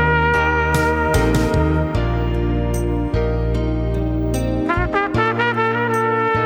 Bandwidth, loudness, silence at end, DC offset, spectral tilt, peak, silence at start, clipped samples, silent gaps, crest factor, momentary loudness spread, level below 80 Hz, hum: over 20 kHz; -18 LUFS; 0 s; under 0.1%; -6.5 dB/octave; -4 dBFS; 0 s; under 0.1%; none; 14 dB; 4 LU; -24 dBFS; none